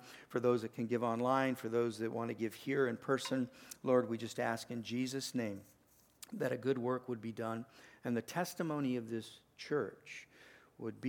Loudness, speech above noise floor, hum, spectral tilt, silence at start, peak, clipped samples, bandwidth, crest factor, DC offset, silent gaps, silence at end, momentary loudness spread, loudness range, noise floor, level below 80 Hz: -38 LUFS; 27 dB; none; -5.5 dB/octave; 0 s; -18 dBFS; under 0.1%; 19 kHz; 20 dB; under 0.1%; none; 0 s; 14 LU; 5 LU; -64 dBFS; -82 dBFS